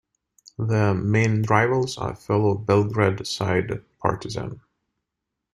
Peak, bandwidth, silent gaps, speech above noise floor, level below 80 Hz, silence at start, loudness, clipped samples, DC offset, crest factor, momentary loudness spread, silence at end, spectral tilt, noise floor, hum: -2 dBFS; 12 kHz; none; 61 dB; -54 dBFS; 0.6 s; -23 LUFS; under 0.1%; under 0.1%; 20 dB; 12 LU; 0.95 s; -6.5 dB/octave; -83 dBFS; none